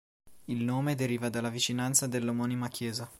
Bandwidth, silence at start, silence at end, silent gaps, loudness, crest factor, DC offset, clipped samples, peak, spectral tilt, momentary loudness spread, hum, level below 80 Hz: 16.5 kHz; 0.25 s; 0.05 s; none; -31 LUFS; 22 dB; under 0.1%; under 0.1%; -10 dBFS; -4 dB/octave; 8 LU; none; -68 dBFS